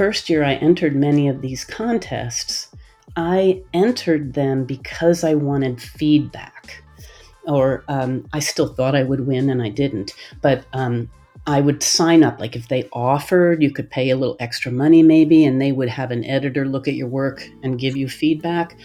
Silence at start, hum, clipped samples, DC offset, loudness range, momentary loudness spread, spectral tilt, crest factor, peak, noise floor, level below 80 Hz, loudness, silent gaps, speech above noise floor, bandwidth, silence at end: 0 s; none; under 0.1%; under 0.1%; 5 LU; 13 LU; -5.5 dB/octave; 16 dB; -2 dBFS; -43 dBFS; -48 dBFS; -18 LUFS; none; 25 dB; 14.5 kHz; 0.1 s